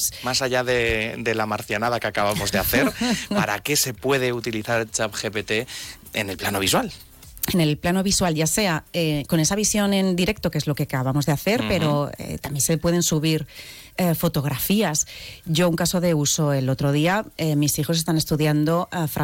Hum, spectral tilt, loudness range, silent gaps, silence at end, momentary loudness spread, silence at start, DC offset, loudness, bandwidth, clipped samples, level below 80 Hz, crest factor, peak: none; -4 dB/octave; 3 LU; none; 0 s; 6 LU; 0 s; under 0.1%; -22 LUFS; 17.5 kHz; under 0.1%; -46 dBFS; 12 dB; -10 dBFS